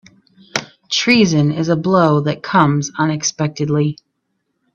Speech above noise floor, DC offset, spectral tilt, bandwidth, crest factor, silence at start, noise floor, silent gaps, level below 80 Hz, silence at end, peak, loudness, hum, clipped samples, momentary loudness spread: 55 dB; under 0.1%; -5 dB/octave; 7.4 kHz; 16 dB; 0.55 s; -70 dBFS; none; -54 dBFS; 0.8 s; 0 dBFS; -16 LUFS; none; under 0.1%; 12 LU